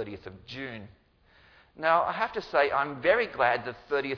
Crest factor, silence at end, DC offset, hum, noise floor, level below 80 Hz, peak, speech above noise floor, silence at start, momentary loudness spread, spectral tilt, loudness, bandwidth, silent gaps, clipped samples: 20 dB; 0 s; under 0.1%; none; -61 dBFS; -62 dBFS; -10 dBFS; 33 dB; 0 s; 15 LU; -6 dB/octave; -27 LUFS; 5.4 kHz; none; under 0.1%